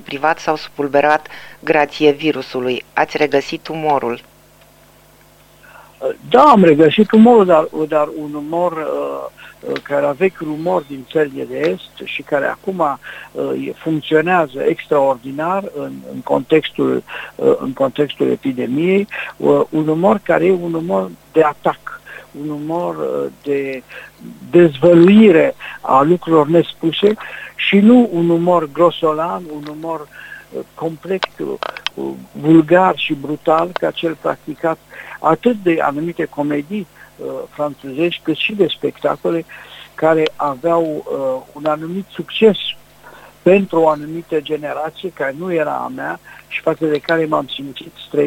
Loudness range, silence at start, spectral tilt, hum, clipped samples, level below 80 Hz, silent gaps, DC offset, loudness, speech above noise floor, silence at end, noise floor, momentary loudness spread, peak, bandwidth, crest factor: 8 LU; 0.05 s; -7 dB/octave; 50 Hz at -55 dBFS; under 0.1%; -56 dBFS; none; under 0.1%; -16 LUFS; 32 dB; 0 s; -47 dBFS; 16 LU; 0 dBFS; 16.5 kHz; 16 dB